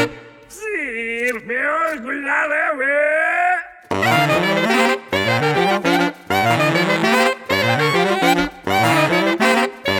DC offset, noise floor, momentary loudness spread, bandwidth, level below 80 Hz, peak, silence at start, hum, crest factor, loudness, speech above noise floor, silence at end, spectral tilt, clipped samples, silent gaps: under 0.1%; -39 dBFS; 7 LU; 19 kHz; -52 dBFS; -2 dBFS; 0 s; none; 16 dB; -17 LUFS; 20 dB; 0 s; -4.5 dB/octave; under 0.1%; none